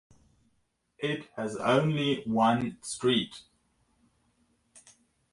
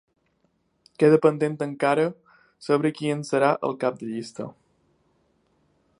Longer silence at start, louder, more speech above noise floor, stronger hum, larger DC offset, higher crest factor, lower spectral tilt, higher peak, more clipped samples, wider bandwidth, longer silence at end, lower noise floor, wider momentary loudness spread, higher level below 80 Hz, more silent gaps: about the same, 1 s vs 1 s; second, -29 LUFS vs -23 LUFS; about the same, 47 dB vs 47 dB; neither; neither; about the same, 20 dB vs 22 dB; second, -5 dB/octave vs -6.5 dB/octave; second, -12 dBFS vs -4 dBFS; neither; about the same, 11.5 kHz vs 11 kHz; second, 0.55 s vs 1.5 s; first, -75 dBFS vs -69 dBFS; second, 11 LU vs 16 LU; first, -66 dBFS vs -74 dBFS; neither